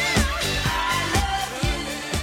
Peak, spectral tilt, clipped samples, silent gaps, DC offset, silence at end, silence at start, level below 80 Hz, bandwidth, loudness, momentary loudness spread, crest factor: -6 dBFS; -3.5 dB/octave; under 0.1%; none; under 0.1%; 0 s; 0 s; -32 dBFS; 17 kHz; -23 LUFS; 5 LU; 18 dB